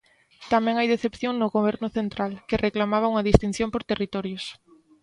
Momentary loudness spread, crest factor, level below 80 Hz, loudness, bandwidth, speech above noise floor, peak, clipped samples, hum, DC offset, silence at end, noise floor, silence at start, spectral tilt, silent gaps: 9 LU; 24 dB; -40 dBFS; -25 LUFS; 11 kHz; 26 dB; 0 dBFS; under 0.1%; none; under 0.1%; 0.5 s; -50 dBFS; 0.4 s; -6.5 dB/octave; none